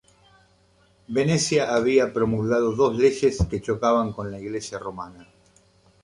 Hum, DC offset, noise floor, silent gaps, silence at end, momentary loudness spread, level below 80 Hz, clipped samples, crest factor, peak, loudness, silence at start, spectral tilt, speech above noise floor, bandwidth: none; under 0.1%; -60 dBFS; none; 0.8 s; 13 LU; -42 dBFS; under 0.1%; 18 dB; -6 dBFS; -23 LUFS; 1.1 s; -5.5 dB/octave; 38 dB; 11 kHz